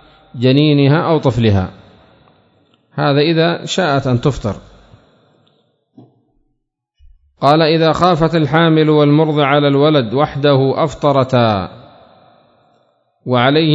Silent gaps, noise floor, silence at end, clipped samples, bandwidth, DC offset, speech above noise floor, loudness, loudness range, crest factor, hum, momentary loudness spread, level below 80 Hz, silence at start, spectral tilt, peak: none; -69 dBFS; 0 s; under 0.1%; 7.8 kHz; under 0.1%; 57 dB; -13 LUFS; 9 LU; 14 dB; none; 8 LU; -44 dBFS; 0.35 s; -7 dB/octave; 0 dBFS